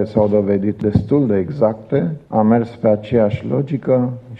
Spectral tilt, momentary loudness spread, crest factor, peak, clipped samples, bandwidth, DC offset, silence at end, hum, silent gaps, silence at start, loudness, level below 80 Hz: -10.5 dB/octave; 5 LU; 14 dB; -2 dBFS; under 0.1%; 5.6 kHz; under 0.1%; 0 s; none; none; 0 s; -17 LUFS; -44 dBFS